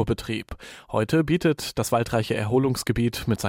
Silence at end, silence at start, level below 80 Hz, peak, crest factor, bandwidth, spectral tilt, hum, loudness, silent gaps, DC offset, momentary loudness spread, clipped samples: 0 s; 0 s; -44 dBFS; -10 dBFS; 14 dB; 16.5 kHz; -5.5 dB/octave; none; -24 LUFS; none; under 0.1%; 9 LU; under 0.1%